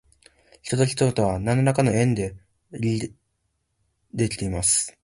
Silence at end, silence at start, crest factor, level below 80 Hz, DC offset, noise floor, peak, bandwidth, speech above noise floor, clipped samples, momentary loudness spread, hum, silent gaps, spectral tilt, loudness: 0.15 s; 0.65 s; 18 dB; -46 dBFS; under 0.1%; -74 dBFS; -6 dBFS; 11.5 kHz; 51 dB; under 0.1%; 14 LU; none; none; -5 dB/octave; -23 LUFS